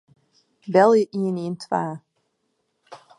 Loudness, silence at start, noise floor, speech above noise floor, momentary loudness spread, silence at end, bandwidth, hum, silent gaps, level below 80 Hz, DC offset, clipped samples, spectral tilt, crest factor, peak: -21 LUFS; 0.65 s; -73 dBFS; 53 dB; 19 LU; 0.2 s; 11 kHz; none; none; -72 dBFS; under 0.1%; under 0.1%; -7 dB/octave; 20 dB; -4 dBFS